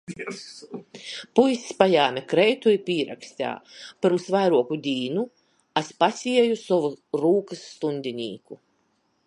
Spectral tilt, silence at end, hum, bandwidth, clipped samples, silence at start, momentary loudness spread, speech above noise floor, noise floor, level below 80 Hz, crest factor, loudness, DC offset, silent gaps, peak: -5 dB/octave; 0.7 s; none; 11 kHz; under 0.1%; 0.1 s; 17 LU; 45 dB; -69 dBFS; -72 dBFS; 24 dB; -23 LUFS; under 0.1%; none; 0 dBFS